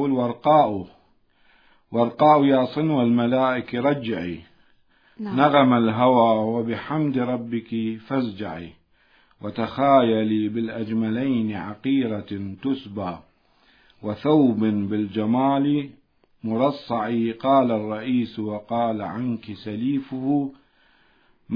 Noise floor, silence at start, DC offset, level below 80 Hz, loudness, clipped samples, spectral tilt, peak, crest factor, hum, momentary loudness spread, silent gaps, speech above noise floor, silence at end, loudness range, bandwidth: -60 dBFS; 0 s; under 0.1%; -62 dBFS; -22 LUFS; under 0.1%; -9.5 dB/octave; -2 dBFS; 20 dB; none; 15 LU; none; 38 dB; 0 s; 6 LU; 5.2 kHz